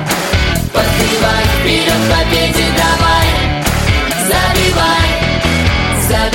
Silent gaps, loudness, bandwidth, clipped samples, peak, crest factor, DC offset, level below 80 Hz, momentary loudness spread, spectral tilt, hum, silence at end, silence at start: none; -12 LUFS; 17 kHz; under 0.1%; 0 dBFS; 12 dB; under 0.1%; -20 dBFS; 3 LU; -4 dB/octave; none; 0 s; 0 s